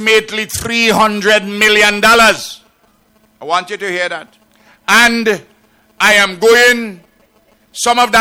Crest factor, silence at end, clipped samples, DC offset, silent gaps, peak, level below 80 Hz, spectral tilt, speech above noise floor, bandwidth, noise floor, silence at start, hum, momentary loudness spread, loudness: 12 dB; 0 s; under 0.1%; under 0.1%; none; 0 dBFS; -46 dBFS; -2 dB/octave; 42 dB; 17.5 kHz; -53 dBFS; 0 s; none; 14 LU; -10 LUFS